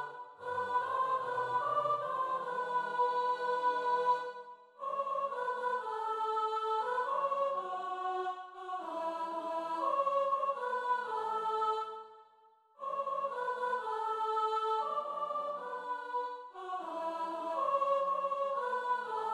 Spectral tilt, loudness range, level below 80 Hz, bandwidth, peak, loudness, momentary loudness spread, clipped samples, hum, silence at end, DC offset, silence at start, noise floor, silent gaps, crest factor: -4 dB/octave; 3 LU; -88 dBFS; 11.5 kHz; -20 dBFS; -35 LUFS; 9 LU; under 0.1%; none; 0 s; under 0.1%; 0 s; -65 dBFS; none; 14 dB